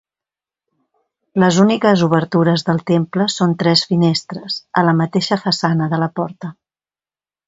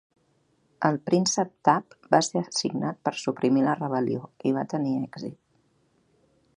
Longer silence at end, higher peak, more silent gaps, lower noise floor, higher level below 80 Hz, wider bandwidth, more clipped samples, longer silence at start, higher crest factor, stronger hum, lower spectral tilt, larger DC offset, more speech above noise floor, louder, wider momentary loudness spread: second, 0.95 s vs 1.25 s; about the same, 0 dBFS vs -2 dBFS; neither; first, under -90 dBFS vs -68 dBFS; first, -58 dBFS vs -72 dBFS; second, 8 kHz vs 11 kHz; neither; first, 1.35 s vs 0.8 s; second, 16 dB vs 24 dB; neither; first, -6 dB/octave vs -4.5 dB/octave; neither; first, over 75 dB vs 42 dB; first, -16 LUFS vs -26 LUFS; first, 11 LU vs 7 LU